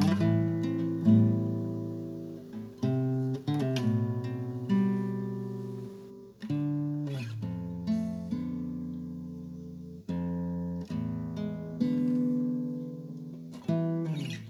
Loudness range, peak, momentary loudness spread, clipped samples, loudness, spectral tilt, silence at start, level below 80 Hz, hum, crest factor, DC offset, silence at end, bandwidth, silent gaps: 7 LU; -12 dBFS; 14 LU; under 0.1%; -32 LUFS; -8.5 dB/octave; 0 s; -62 dBFS; none; 18 dB; under 0.1%; 0 s; 12.5 kHz; none